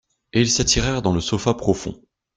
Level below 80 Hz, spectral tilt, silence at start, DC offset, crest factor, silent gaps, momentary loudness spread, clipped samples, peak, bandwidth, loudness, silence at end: -38 dBFS; -4 dB/octave; 0.35 s; under 0.1%; 18 dB; none; 8 LU; under 0.1%; -2 dBFS; 10 kHz; -20 LUFS; 0.4 s